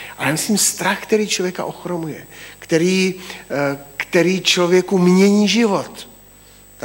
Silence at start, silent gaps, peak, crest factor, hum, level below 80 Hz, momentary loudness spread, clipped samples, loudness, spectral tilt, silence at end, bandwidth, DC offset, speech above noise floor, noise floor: 0 s; none; -2 dBFS; 16 dB; 50 Hz at -45 dBFS; -56 dBFS; 17 LU; under 0.1%; -17 LUFS; -4 dB/octave; 0.75 s; 16.5 kHz; under 0.1%; 28 dB; -45 dBFS